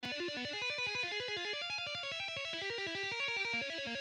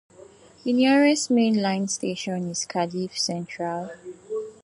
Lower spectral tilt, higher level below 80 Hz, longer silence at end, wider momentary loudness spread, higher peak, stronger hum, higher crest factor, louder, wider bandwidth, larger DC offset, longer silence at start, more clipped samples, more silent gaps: second, -2 dB/octave vs -4 dB/octave; second, -76 dBFS vs -70 dBFS; about the same, 0 s vs 0.1 s; second, 3 LU vs 14 LU; second, -26 dBFS vs -8 dBFS; neither; about the same, 12 dB vs 16 dB; second, -37 LUFS vs -24 LUFS; about the same, 12 kHz vs 11.5 kHz; neither; second, 0 s vs 0.2 s; neither; neither